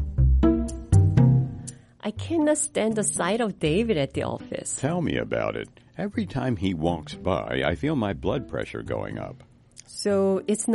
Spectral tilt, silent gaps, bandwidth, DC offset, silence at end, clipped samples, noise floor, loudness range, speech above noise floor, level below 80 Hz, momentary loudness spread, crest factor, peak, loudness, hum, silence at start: -6 dB/octave; none; 11.5 kHz; under 0.1%; 0 s; under 0.1%; -47 dBFS; 5 LU; 22 dB; -34 dBFS; 13 LU; 18 dB; -6 dBFS; -25 LUFS; none; 0 s